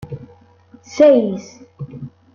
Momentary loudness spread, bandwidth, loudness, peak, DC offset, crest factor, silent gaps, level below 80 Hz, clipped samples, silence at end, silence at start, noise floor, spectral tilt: 23 LU; 7.2 kHz; -13 LUFS; -2 dBFS; under 0.1%; 16 dB; none; -58 dBFS; under 0.1%; 0.25 s; 0 s; -48 dBFS; -7 dB/octave